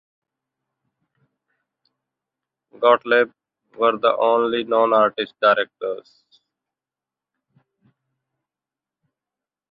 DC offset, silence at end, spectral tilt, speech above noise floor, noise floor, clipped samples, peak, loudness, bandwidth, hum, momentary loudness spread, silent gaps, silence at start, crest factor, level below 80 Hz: under 0.1%; 3.7 s; -6.5 dB/octave; 70 dB; -89 dBFS; under 0.1%; -2 dBFS; -19 LUFS; 5.2 kHz; none; 10 LU; none; 2.8 s; 22 dB; -74 dBFS